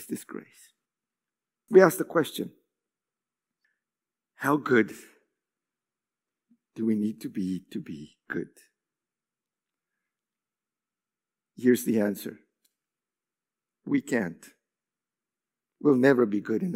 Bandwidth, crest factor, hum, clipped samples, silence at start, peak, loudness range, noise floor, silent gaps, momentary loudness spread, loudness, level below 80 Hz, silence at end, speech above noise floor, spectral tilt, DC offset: 16 kHz; 28 dB; none; under 0.1%; 0 s; -2 dBFS; 9 LU; under -90 dBFS; none; 21 LU; -26 LUFS; -80 dBFS; 0 s; over 64 dB; -6 dB/octave; under 0.1%